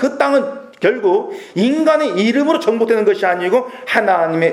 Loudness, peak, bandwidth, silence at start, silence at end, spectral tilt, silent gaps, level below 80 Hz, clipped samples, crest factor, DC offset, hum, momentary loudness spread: -15 LUFS; 0 dBFS; 13.5 kHz; 0 s; 0 s; -5.5 dB/octave; none; -70 dBFS; under 0.1%; 14 dB; under 0.1%; none; 4 LU